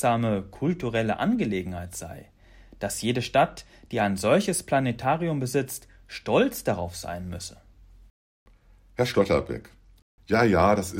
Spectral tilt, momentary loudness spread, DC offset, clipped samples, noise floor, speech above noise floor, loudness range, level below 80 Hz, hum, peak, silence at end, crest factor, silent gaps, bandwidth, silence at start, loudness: -5.5 dB/octave; 16 LU; under 0.1%; under 0.1%; -55 dBFS; 30 dB; 5 LU; -52 dBFS; none; -8 dBFS; 0 s; 18 dB; 8.10-8.46 s, 10.02-10.18 s; 16 kHz; 0 s; -26 LUFS